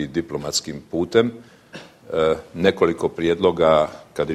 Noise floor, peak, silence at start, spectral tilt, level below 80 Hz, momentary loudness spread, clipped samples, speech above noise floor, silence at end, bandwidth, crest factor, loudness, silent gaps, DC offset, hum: -42 dBFS; -2 dBFS; 0 s; -4.5 dB/octave; -50 dBFS; 14 LU; under 0.1%; 22 dB; 0 s; 13.5 kHz; 20 dB; -21 LUFS; none; under 0.1%; none